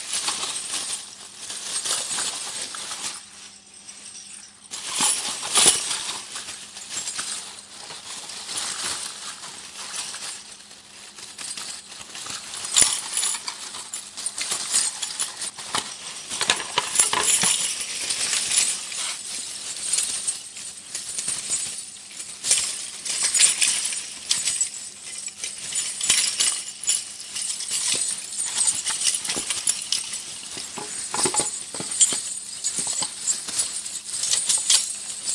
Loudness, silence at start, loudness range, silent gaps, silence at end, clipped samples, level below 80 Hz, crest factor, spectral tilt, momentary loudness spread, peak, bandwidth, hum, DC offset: -23 LUFS; 0 s; 9 LU; none; 0 s; under 0.1%; -66 dBFS; 26 dB; 1.5 dB/octave; 17 LU; 0 dBFS; 12 kHz; none; under 0.1%